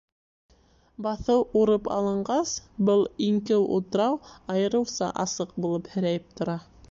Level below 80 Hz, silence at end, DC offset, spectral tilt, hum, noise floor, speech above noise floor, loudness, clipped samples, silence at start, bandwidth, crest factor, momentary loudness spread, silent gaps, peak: -56 dBFS; 0.3 s; under 0.1%; -5.5 dB/octave; none; -58 dBFS; 32 dB; -26 LUFS; under 0.1%; 1 s; 7.6 kHz; 14 dB; 9 LU; none; -12 dBFS